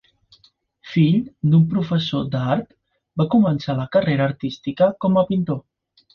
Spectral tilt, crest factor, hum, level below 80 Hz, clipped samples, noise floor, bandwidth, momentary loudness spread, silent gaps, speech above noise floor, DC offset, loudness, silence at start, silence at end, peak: -9 dB/octave; 16 dB; none; -54 dBFS; under 0.1%; -58 dBFS; 6.4 kHz; 9 LU; none; 39 dB; under 0.1%; -20 LUFS; 0.85 s; 0.55 s; -6 dBFS